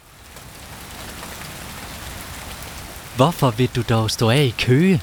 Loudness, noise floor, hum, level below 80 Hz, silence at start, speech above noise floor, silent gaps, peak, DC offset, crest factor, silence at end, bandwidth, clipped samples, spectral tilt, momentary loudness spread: -18 LUFS; -41 dBFS; none; -42 dBFS; 0.2 s; 24 dB; none; -2 dBFS; under 0.1%; 20 dB; 0 s; over 20 kHz; under 0.1%; -5.5 dB/octave; 20 LU